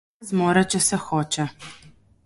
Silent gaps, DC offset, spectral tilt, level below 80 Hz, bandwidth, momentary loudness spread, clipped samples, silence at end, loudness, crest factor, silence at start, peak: none; under 0.1%; -4 dB/octave; -58 dBFS; 12 kHz; 16 LU; under 0.1%; 0.5 s; -22 LUFS; 20 dB; 0.2 s; -4 dBFS